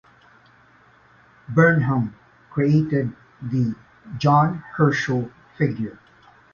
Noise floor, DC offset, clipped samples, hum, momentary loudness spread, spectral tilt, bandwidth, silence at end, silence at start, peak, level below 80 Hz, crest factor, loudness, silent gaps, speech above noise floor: -54 dBFS; under 0.1%; under 0.1%; none; 15 LU; -8 dB/octave; 7 kHz; 0.6 s; 1.5 s; -4 dBFS; -56 dBFS; 18 dB; -21 LUFS; none; 34 dB